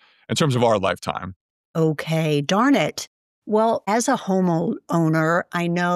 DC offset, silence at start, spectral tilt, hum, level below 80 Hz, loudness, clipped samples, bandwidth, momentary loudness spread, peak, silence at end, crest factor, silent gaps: under 0.1%; 0.3 s; -5.5 dB/octave; none; -62 dBFS; -21 LUFS; under 0.1%; 14 kHz; 10 LU; -4 dBFS; 0 s; 16 dB; 1.36-1.74 s, 3.07-3.42 s